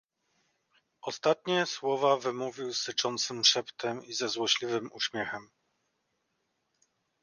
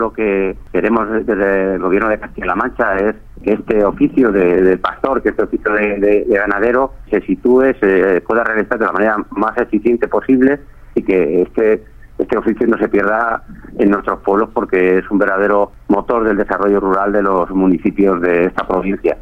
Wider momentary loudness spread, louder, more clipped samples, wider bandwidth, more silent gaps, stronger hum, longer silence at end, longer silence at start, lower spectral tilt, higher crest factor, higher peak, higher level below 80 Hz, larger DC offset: first, 12 LU vs 6 LU; second, -30 LUFS vs -15 LUFS; neither; first, 11 kHz vs 5.4 kHz; neither; neither; first, 1.8 s vs 0 s; first, 1.05 s vs 0 s; second, -2 dB/octave vs -8.5 dB/octave; first, 24 dB vs 14 dB; second, -10 dBFS vs 0 dBFS; second, -80 dBFS vs -38 dBFS; neither